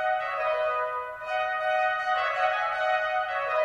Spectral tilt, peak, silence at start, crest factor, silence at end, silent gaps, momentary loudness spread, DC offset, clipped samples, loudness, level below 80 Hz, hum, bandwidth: -1.5 dB/octave; -14 dBFS; 0 s; 12 dB; 0 s; none; 4 LU; under 0.1%; under 0.1%; -27 LUFS; -64 dBFS; none; 10.5 kHz